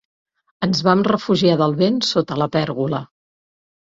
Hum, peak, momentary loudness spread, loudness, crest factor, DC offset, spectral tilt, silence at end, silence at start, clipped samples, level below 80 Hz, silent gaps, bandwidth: none; -2 dBFS; 7 LU; -18 LUFS; 18 dB; under 0.1%; -6 dB/octave; 0.8 s; 0.6 s; under 0.1%; -56 dBFS; none; 7.8 kHz